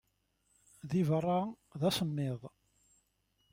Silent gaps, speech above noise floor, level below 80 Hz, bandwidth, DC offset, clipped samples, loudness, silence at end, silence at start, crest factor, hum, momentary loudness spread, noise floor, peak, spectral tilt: none; 44 dB; -70 dBFS; 16.5 kHz; under 0.1%; under 0.1%; -34 LUFS; 1.05 s; 0.85 s; 18 dB; none; 15 LU; -77 dBFS; -20 dBFS; -6.5 dB/octave